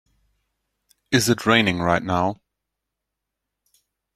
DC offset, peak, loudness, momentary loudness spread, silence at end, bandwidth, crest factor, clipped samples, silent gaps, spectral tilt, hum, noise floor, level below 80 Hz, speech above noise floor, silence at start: under 0.1%; -2 dBFS; -20 LUFS; 8 LU; 1.8 s; 16 kHz; 22 dB; under 0.1%; none; -4.5 dB/octave; none; -83 dBFS; -56 dBFS; 63 dB; 1.1 s